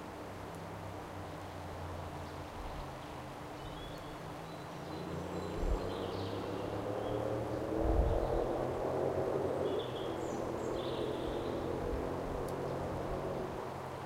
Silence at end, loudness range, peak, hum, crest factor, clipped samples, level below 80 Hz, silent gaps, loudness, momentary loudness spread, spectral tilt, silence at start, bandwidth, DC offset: 0 s; 9 LU; -18 dBFS; none; 20 dB; under 0.1%; -46 dBFS; none; -39 LUFS; 10 LU; -6.5 dB/octave; 0 s; 16 kHz; under 0.1%